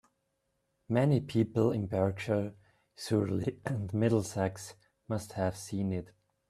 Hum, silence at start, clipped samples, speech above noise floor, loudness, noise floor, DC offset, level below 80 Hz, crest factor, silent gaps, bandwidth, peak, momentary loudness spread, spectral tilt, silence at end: none; 0.9 s; under 0.1%; 48 dB; -32 LUFS; -79 dBFS; under 0.1%; -64 dBFS; 18 dB; none; 13.5 kHz; -14 dBFS; 10 LU; -7 dB/octave; 0.45 s